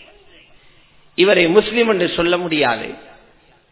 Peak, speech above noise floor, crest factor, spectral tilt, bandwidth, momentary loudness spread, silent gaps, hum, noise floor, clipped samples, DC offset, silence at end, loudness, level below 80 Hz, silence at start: 0 dBFS; 36 dB; 18 dB; -9 dB/octave; 4 kHz; 14 LU; none; none; -52 dBFS; under 0.1%; under 0.1%; 0.7 s; -16 LUFS; -50 dBFS; 1.2 s